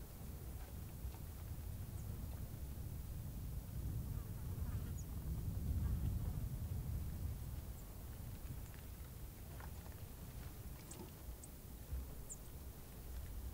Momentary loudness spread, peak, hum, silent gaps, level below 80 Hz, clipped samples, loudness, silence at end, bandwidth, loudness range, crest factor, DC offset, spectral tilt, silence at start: 9 LU; -30 dBFS; none; none; -50 dBFS; under 0.1%; -49 LUFS; 0 s; 16 kHz; 8 LU; 16 dB; under 0.1%; -6 dB/octave; 0 s